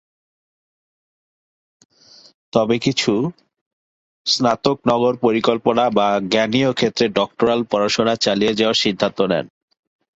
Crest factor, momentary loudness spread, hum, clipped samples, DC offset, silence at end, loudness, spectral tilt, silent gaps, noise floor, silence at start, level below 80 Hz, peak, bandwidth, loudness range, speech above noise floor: 18 dB; 4 LU; none; under 0.1%; under 0.1%; 0.7 s; -18 LUFS; -4.5 dB/octave; 3.61-4.25 s; under -90 dBFS; 2.55 s; -56 dBFS; -2 dBFS; 8 kHz; 6 LU; over 72 dB